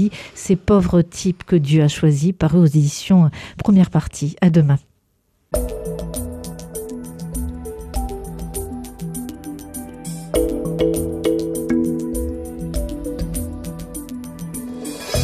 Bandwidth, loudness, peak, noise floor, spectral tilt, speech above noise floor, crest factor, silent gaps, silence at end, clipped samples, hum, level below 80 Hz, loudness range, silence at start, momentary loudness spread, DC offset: 14 kHz; -20 LUFS; -4 dBFS; -64 dBFS; -7 dB/octave; 48 dB; 16 dB; none; 0 s; under 0.1%; none; -34 dBFS; 13 LU; 0 s; 16 LU; under 0.1%